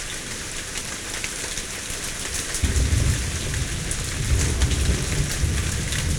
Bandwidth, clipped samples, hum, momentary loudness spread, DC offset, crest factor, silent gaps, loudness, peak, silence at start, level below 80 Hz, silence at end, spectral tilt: 19 kHz; under 0.1%; none; 7 LU; under 0.1%; 16 dB; none; -25 LUFS; -8 dBFS; 0 s; -28 dBFS; 0 s; -3.5 dB/octave